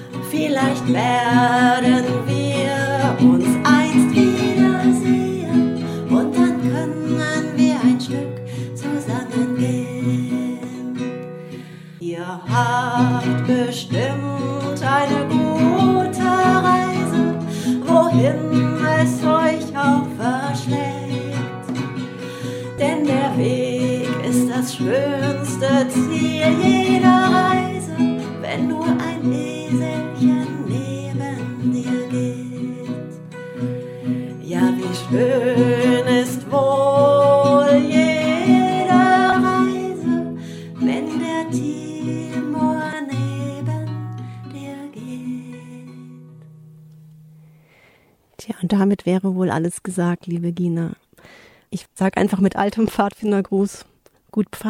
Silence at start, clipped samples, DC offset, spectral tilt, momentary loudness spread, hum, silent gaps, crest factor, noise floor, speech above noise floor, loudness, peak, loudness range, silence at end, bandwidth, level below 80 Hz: 0 s; under 0.1%; under 0.1%; -6 dB/octave; 14 LU; none; none; 18 dB; -56 dBFS; 38 dB; -19 LUFS; -2 dBFS; 9 LU; 0 s; 15 kHz; -58 dBFS